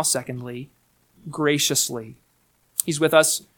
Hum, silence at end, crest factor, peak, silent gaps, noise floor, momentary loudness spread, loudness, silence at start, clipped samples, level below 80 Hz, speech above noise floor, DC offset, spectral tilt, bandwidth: none; 0.2 s; 24 dB; 0 dBFS; none; -64 dBFS; 19 LU; -21 LUFS; 0 s; under 0.1%; -64 dBFS; 42 dB; under 0.1%; -2.5 dB/octave; 19 kHz